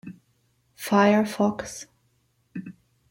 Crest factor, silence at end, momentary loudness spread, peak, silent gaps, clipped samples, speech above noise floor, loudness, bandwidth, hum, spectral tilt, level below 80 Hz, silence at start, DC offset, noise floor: 20 dB; 0.4 s; 26 LU; -6 dBFS; none; under 0.1%; 46 dB; -22 LUFS; 16.5 kHz; none; -5.5 dB/octave; -64 dBFS; 0.05 s; under 0.1%; -68 dBFS